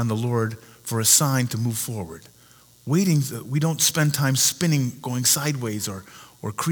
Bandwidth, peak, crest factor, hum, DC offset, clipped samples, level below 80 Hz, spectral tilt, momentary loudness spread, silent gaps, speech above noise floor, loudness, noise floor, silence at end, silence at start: over 20 kHz; 0 dBFS; 22 dB; none; under 0.1%; under 0.1%; -62 dBFS; -3.5 dB/octave; 16 LU; none; 30 dB; -21 LUFS; -53 dBFS; 0 s; 0 s